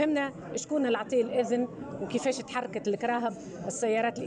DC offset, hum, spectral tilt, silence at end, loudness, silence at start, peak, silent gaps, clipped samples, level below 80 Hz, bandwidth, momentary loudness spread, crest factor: under 0.1%; none; -4.5 dB/octave; 0 s; -30 LUFS; 0 s; -16 dBFS; none; under 0.1%; -68 dBFS; 10.5 kHz; 8 LU; 14 dB